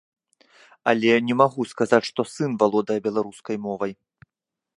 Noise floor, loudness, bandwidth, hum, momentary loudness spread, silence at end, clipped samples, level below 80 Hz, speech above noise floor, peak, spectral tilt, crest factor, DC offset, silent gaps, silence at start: -87 dBFS; -23 LUFS; 11.5 kHz; none; 11 LU; 0.85 s; under 0.1%; -70 dBFS; 65 dB; -2 dBFS; -5.5 dB/octave; 22 dB; under 0.1%; none; 0.85 s